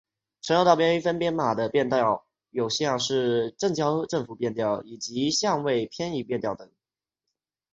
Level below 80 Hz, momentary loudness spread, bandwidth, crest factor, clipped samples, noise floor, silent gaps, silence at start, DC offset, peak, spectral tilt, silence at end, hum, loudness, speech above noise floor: -62 dBFS; 10 LU; 8.2 kHz; 22 dB; under 0.1%; under -90 dBFS; none; 0.45 s; under 0.1%; -4 dBFS; -4.5 dB/octave; 1.1 s; none; -25 LUFS; over 65 dB